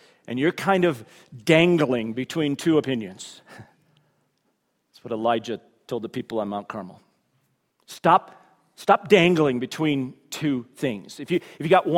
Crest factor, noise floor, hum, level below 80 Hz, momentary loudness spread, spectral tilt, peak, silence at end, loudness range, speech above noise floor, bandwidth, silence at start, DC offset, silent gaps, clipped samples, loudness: 22 dB; -72 dBFS; none; -64 dBFS; 18 LU; -6 dB/octave; -2 dBFS; 0 s; 9 LU; 49 dB; 16.5 kHz; 0.3 s; under 0.1%; none; under 0.1%; -23 LUFS